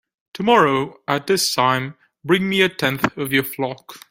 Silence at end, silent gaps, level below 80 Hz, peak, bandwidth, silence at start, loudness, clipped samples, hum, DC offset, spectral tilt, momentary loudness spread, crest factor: 0.15 s; none; -58 dBFS; -2 dBFS; 16.5 kHz; 0.35 s; -19 LUFS; under 0.1%; none; under 0.1%; -4 dB/octave; 12 LU; 18 dB